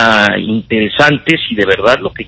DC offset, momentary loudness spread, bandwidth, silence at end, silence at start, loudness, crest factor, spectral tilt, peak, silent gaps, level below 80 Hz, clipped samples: under 0.1%; 5 LU; 8 kHz; 0.05 s; 0 s; -11 LUFS; 12 dB; -5 dB/octave; 0 dBFS; none; -40 dBFS; 1%